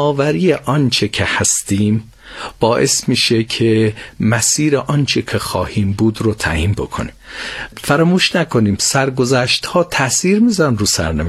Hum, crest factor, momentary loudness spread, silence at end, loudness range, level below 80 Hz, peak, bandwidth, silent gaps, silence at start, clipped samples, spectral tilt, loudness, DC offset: none; 16 dB; 9 LU; 0 s; 3 LU; -36 dBFS; 0 dBFS; 14.5 kHz; none; 0 s; under 0.1%; -4 dB/octave; -15 LUFS; under 0.1%